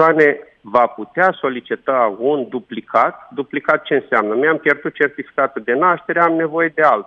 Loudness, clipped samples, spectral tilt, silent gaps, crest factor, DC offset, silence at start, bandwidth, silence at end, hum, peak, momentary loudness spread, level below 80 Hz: -17 LUFS; under 0.1%; -7 dB/octave; none; 16 dB; under 0.1%; 0 s; 7 kHz; 0.05 s; none; 0 dBFS; 8 LU; -66 dBFS